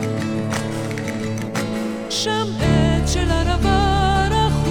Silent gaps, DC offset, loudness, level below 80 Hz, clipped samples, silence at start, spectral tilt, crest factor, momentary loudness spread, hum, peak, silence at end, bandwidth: none; under 0.1%; -20 LUFS; -26 dBFS; under 0.1%; 0 s; -5.5 dB/octave; 16 dB; 8 LU; none; -2 dBFS; 0 s; 16.5 kHz